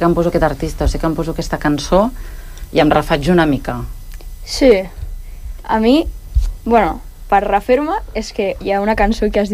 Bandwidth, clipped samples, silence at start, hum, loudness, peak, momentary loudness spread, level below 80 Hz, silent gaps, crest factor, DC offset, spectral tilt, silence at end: 15.5 kHz; under 0.1%; 0 s; none; -16 LUFS; 0 dBFS; 19 LU; -26 dBFS; none; 16 dB; under 0.1%; -6 dB/octave; 0 s